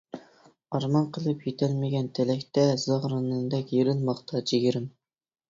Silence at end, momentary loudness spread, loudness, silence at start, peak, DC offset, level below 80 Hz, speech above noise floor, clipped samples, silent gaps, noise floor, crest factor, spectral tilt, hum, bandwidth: 0.6 s; 8 LU; -27 LUFS; 0.15 s; -10 dBFS; under 0.1%; -66 dBFS; 32 dB; under 0.1%; none; -58 dBFS; 18 dB; -7 dB/octave; none; 7.6 kHz